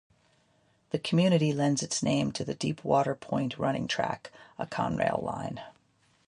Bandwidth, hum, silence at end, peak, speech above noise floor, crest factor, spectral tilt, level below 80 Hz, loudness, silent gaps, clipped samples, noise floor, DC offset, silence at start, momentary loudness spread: 11.5 kHz; none; 0.6 s; -12 dBFS; 39 dB; 18 dB; -5.5 dB/octave; -62 dBFS; -29 LUFS; none; under 0.1%; -68 dBFS; under 0.1%; 0.95 s; 12 LU